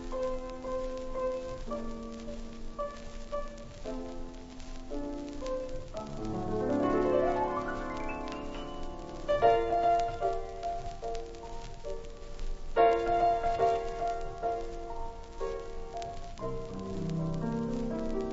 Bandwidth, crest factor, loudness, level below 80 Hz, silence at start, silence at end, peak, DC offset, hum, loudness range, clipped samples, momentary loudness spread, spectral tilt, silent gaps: 8 kHz; 20 dB; -33 LUFS; -42 dBFS; 0 s; 0 s; -12 dBFS; under 0.1%; none; 10 LU; under 0.1%; 17 LU; -6.5 dB/octave; none